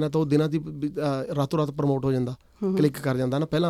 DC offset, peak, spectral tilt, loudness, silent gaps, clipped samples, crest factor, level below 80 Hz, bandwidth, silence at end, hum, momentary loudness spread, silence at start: under 0.1%; -8 dBFS; -7.5 dB/octave; -26 LUFS; none; under 0.1%; 16 dB; -56 dBFS; 14 kHz; 0 s; none; 6 LU; 0 s